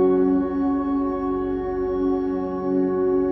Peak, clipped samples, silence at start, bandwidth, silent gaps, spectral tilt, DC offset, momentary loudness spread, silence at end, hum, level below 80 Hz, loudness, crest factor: -10 dBFS; under 0.1%; 0 s; 5.8 kHz; none; -11 dB/octave; under 0.1%; 5 LU; 0 s; none; -44 dBFS; -23 LUFS; 12 dB